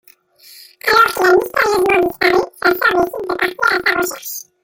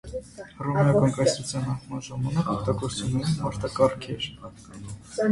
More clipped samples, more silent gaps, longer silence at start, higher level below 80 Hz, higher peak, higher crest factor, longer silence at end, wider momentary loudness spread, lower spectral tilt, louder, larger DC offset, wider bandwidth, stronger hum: neither; neither; first, 0.55 s vs 0.05 s; about the same, -50 dBFS vs -50 dBFS; first, -2 dBFS vs -6 dBFS; second, 14 dB vs 20 dB; first, 0.2 s vs 0 s; second, 8 LU vs 19 LU; second, -3 dB/octave vs -6 dB/octave; first, -14 LUFS vs -26 LUFS; neither; first, 17 kHz vs 11.5 kHz; neither